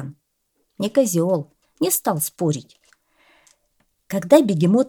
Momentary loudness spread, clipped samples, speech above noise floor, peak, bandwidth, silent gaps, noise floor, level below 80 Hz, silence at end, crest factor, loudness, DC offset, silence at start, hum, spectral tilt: 13 LU; under 0.1%; 52 dB; 0 dBFS; 20 kHz; none; -71 dBFS; -68 dBFS; 0 s; 20 dB; -20 LUFS; under 0.1%; 0 s; none; -5.5 dB/octave